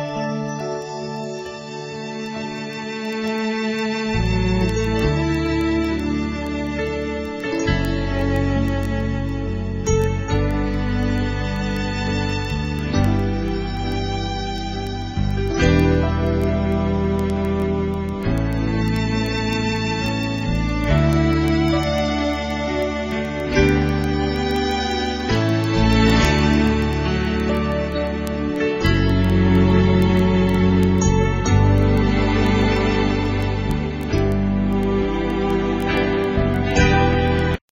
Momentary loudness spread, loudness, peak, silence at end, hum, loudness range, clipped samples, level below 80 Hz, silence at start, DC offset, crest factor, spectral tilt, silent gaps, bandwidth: 9 LU; -20 LUFS; -2 dBFS; 0.15 s; none; 5 LU; under 0.1%; -28 dBFS; 0 s; under 0.1%; 16 dB; -6.5 dB/octave; none; 15.5 kHz